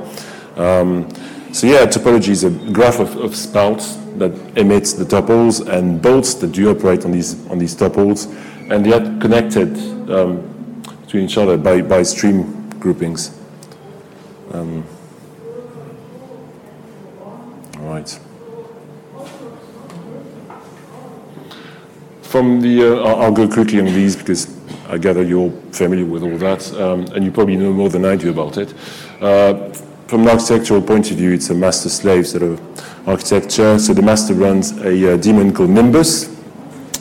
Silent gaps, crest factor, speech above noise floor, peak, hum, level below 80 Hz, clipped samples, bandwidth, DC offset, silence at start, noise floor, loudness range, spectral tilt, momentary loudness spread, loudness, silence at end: none; 12 dB; 25 dB; -2 dBFS; none; -46 dBFS; under 0.1%; 17 kHz; under 0.1%; 0 s; -38 dBFS; 19 LU; -5.5 dB/octave; 22 LU; -14 LUFS; 0 s